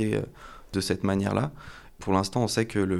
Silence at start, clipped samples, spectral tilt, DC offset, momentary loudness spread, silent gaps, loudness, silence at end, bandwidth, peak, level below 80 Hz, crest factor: 0 s; under 0.1%; -5.5 dB/octave; under 0.1%; 17 LU; none; -28 LUFS; 0 s; 15 kHz; -10 dBFS; -50 dBFS; 18 dB